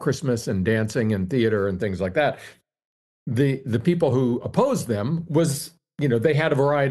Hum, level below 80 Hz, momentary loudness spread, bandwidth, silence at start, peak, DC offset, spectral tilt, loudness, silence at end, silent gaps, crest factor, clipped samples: none; -56 dBFS; 6 LU; 12.5 kHz; 0 s; -4 dBFS; under 0.1%; -6.5 dB/octave; -23 LUFS; 0 s; 2.85-3.26 s; 18 dB; under 0.1%